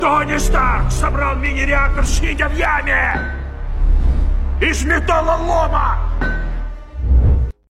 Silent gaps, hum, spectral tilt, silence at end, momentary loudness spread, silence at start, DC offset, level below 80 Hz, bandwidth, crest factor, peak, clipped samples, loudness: none; none; -5 dB/octave; 0.2 s; 9 LU; 0 s; under 0.1%; -18 dBFS; 12.5 kHz; 12 dB; -2 dBFS; under 0.1%; -17 LUFS